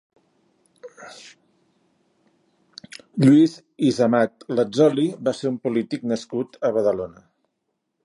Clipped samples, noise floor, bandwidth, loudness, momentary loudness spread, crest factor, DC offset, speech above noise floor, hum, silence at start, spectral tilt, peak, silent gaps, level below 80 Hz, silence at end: under 0.1%; -76 dBFS; 11.5 kHz; -21 LUFS; 24 LU; 18 dB; under 0.1%; 56 dB; none; 0.85 s; -7 dB/octave; -4 dBFS; none; -66 dBFS; 0.95 s